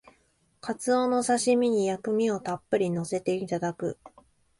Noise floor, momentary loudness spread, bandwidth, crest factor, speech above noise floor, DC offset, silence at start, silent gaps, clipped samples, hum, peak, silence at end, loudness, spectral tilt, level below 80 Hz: -67 dBFS; 11 LU; 11.5 kHz; 16 dB; 41 dB; under 0.1%; 0.65 s; none; under 0.1%; none; -12 dBFS; 0.5 s; -27 LUFS; -5 dB/octave; -68 dBFS